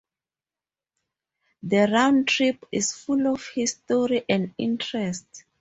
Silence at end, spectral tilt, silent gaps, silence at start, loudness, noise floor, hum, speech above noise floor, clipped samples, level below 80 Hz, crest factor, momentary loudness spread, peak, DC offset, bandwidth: 0.2 s; -4 dB/octave; none; 1.65 s; -23 LUFS; under -90 dBFS; none; over 67 dB; under 0.1%; -64 dBFS; 20 dB; 9 LU; -6 dBFS; under 0.1%; 8.2 kHz